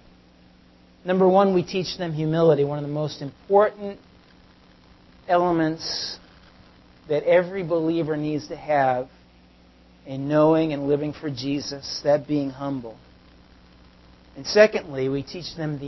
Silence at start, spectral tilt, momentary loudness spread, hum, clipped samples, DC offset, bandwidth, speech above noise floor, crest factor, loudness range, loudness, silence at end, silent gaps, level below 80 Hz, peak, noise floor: 1.05 s; -6 dB/octave; 15 LU; none; under 0.1%; under 0.1%; 6.2 kHz; 31 dB; 20 dB; 5 LU; -23 LUFS; 0 s; none; -56 dBFS; -4 dBFS; -53 dBFS